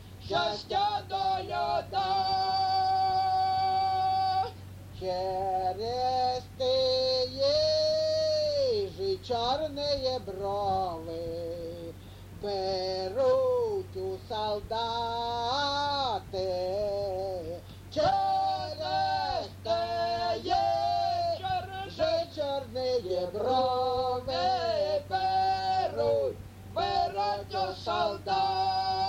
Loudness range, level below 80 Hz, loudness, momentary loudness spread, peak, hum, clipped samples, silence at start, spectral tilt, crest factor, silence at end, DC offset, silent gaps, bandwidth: 4 LU; -54 dBFS; -29 LUFS; 8 LU; -14 dBFS; none; under 0.1%; 0 s; -4.5 dB/octave; 14 dB; 0 s; under 0.1%; none; 16 kHz